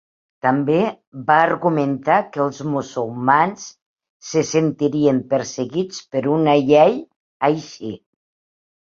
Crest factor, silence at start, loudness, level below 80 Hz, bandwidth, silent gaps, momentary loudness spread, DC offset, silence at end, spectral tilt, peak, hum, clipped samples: 18 dB; 0.45 s; -19 LUFS; -62 dBFS; 7.6 kHz; 1.07-1.12 s, 3.82-3.96 s, 4.09-4.20 s, 7.16-7.40 s; 14 LU; under 0.1%; 0.85 s; -6 dB/octave; -2 dBFS; none; under 0.1%